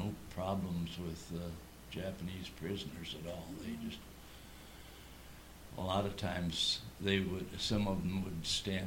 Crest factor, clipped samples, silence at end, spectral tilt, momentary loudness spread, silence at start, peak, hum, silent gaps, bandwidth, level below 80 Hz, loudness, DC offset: 22 dB; under 0.1%; 0 s; -4.5 dB/octave; 19 LU; 0 s; -18 dBFS; none; none; 17.5 kHz; -56 dBFS; -39 LUFS; under 0.1%